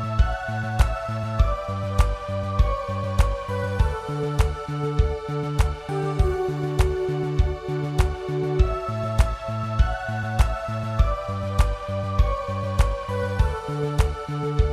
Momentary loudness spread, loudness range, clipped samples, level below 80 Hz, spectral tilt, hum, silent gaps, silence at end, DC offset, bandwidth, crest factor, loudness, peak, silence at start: 4 LU; 1 LU; under 0.1%; -26 dBFS; -7 dB/octave; none; none; 0 s; under 0.1%; 13.5 kHz; 18 dB; -25 LUFS; -6 dBFS; 0 s